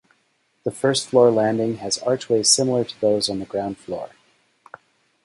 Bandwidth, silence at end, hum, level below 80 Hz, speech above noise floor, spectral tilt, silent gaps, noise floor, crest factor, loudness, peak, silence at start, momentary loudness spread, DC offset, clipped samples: 11.5 kHz; 1.2 s; none; -60 dBFS; 46 dB; -3.5 dB/octave; none; -66 dBFS; 20 dB; -20 LUFS; -2 dBFS; 0.65 s; 15 LU; under 0.1%; under 0.1%